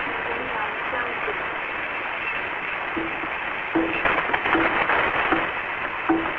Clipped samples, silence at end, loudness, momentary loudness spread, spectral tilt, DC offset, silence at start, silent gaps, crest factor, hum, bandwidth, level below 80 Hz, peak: under 0.1%; 0 s; -24 LUFS; 7 LU; -6.5 dB/octave; under 0.1%; 0 s; none; 20 dB; none; 7 kHz; -50 dBFS; -4 dBFS